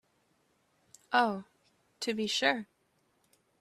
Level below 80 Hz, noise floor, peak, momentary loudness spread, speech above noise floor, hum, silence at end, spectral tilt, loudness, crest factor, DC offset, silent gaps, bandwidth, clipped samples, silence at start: -78 dBFS; -74 dBFS; -12 dBFS; 12 LU; 43 dB; none; 0.95 s; -3 dB/octave; -31 LUFS; 24 dB; under 0.1%; none; 14 kHz; under 0.1%; 1.1 s